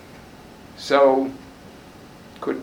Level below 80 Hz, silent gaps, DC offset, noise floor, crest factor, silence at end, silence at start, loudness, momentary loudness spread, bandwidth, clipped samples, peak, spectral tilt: -56 dBFS; none; under 0.1%; -44 dBFS; 20 dB; 0 s; 0.8 s; -20 LUFS; 27 LU; 15.5 kHz; under 0.1%; -4 dBFS; -5 dB/octave